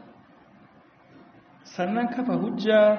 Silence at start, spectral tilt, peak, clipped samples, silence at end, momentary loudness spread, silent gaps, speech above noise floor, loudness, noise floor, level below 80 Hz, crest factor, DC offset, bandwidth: 1.7 s; -4.5 dB/octave; -8 dBFS; under 0.1%; 0 s; 10 LU; none; 33 dB; -25 LUFS; -55 dBFS; -72 dBFS; 18 dB; under 0.1%; 6.6 kHz